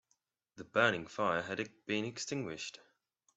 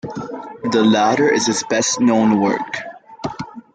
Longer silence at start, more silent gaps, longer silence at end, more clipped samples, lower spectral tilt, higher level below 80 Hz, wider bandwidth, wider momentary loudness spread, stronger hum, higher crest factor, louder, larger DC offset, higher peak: first, 0.55 s vs 0.05 s; neither; first, 0.65 s vs 0.15 s; neither; about the same, -4 dB/octave vs -4 dB/octave; second, -76 dBFS vs -58 dBFS; second, 8.2 kHz vs 9.4 kHz; second, 13 LU vs 16 LU; neither; first, 26 dB vs 14 dB; second, -36 LUFS vs -16 LUFS; neither; second, -12 dBFS vs -4 dBFS